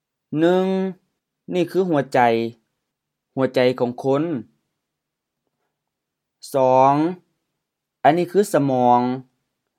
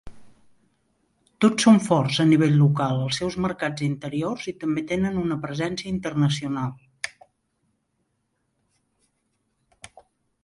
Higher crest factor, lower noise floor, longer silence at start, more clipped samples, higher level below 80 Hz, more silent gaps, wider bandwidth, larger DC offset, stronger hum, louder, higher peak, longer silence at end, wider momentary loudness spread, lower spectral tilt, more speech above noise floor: about the same, 20 dB vs 20 dB; first, -81 dBFS vs -74 dBFS; first, 0.3 s vs 0.05 s; neither; second, -76 dBFS vs -56 dBFS; neither; first, 16 kHz vs 11.5 kHz; neither; neither; first, -19 LUFS vs -23 LUFS; first, 0 dBFS vs -4 dBFS; second, 0.55 s vs 3.35 s; about the same, 12 LU vs 12 LU; about the same, -6.5 dB/octave vs -6 dB/octave; first, 63 dB vs 52 dB